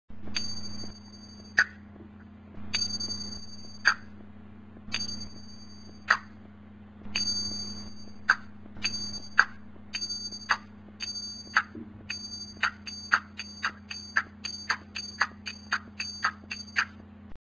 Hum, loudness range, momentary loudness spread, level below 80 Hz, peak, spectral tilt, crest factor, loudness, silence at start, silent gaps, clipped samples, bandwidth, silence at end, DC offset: none; 3 LU; 22 LU; -56 dBFS; -2 dBFS; -1 dB/octave; 32 dB; -31 LUFS; 0.1 s; none; under 0.1%; 8 kHz; 0.05 s; under 0.1%